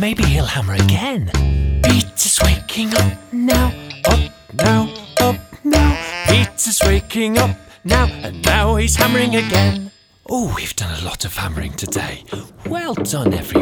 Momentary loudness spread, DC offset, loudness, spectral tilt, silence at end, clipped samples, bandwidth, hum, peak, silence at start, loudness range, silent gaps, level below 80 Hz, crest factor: 9 LU; under 0.1%; -17 LUFS; -4.5 dB/octave; 0 s; under 0.1%; over 20 kHz; none; 0 dBFS; 0 s; 6 LU; none; -24 dBFS; 16 dB